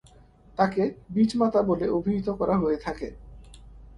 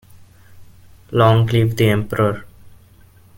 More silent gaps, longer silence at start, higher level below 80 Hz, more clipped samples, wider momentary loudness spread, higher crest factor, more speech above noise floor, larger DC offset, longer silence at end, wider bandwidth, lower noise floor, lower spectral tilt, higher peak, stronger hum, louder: neither; first, 0.6 s vs 0.15 s; about the same, -48 dBFS vs -46 dBFS; neither; first, 12 LU vs 8 LU; about the same, 20 dB vs 20 dB; second, 29 dB vs 33 dB; neither; second, 0.1 s vs 0.7 s; second, 11 kHz vs 17 kHz; first, -54 dBFS vs -48 dBFS; about the same, -7.5 dB/octave vs -7 dB/octave; second, -6 dBFS vs 0 dBFS; neither; second, -25 LUFS vs -16 LUFS